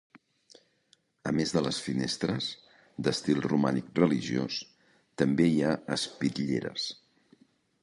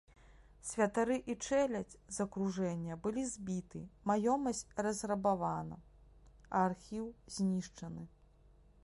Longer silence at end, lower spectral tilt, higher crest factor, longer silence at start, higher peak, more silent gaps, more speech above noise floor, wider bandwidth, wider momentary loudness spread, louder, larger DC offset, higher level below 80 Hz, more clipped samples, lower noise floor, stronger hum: first, 0.9 s vs 0.75 s; about the same, -5.5 dB/octave vs -5.5 dB/octave; about the same, 22 dB vs 20 dB; first, 1.25 s vs 0.3 s; first, -8 dBFS vs -18 dBFS; neither; first, 40 dB vs 27 dB; about the same, 11.5 kHz vs 11.5 kHz; about the same, 12 LU vs 14 LU; first, -30 LUFS vs -37 LUFS; neither; about the same, -62 dBFS vs -62 dBFS; neither; first, -68 dBFS vs -64 dBFS; neither